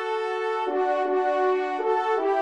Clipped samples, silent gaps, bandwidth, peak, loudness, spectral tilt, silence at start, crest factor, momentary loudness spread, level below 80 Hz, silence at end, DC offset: under 0.1%; none; 9 kHz; -12 dBFS; -25 LUFS; -2.5 dB/octave; 0 s; 12 dB; 4 LU; -78 dBFS; 0 s; 0.1%